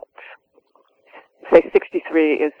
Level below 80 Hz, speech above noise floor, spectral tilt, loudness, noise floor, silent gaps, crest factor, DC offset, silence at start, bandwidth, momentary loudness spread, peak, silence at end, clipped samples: -56 dBFS; 43 dB; -7 dB/octave; -17 LUFS; -59 dBFS; none; 20 dB; under 0.1%; 1.45 s; 5.4 kHz; 6 LU; 0 dBFS; 0.1 s; under 0.1%